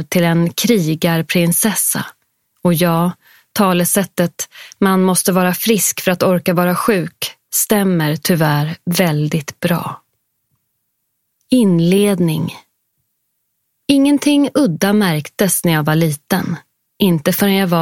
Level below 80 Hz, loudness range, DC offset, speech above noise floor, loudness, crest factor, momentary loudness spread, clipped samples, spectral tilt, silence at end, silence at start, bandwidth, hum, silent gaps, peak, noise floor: -56 dBFS; 3 LU; under 0.1%; 55 dB; -15 LUFS; 16 dB; 8 LU; under 0.1%; -5 dB/octave; 0 s; 0 s; 17 kHz; none; none; 0 dBFS; -70 dBFS